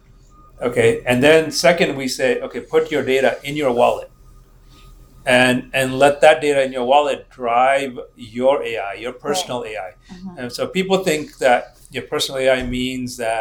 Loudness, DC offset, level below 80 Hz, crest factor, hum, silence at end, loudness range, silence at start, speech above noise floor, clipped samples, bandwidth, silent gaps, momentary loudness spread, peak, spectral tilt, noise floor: -18 LUFS; under 0.1%; -46 dBFS; 18 dB; none; 0 s; 6 LU; 0.6 s; 29 dB; under 0.1%; 20 kHz; none; 15 LU; 0 dBFS; -4 dB/octave; -47 dBFS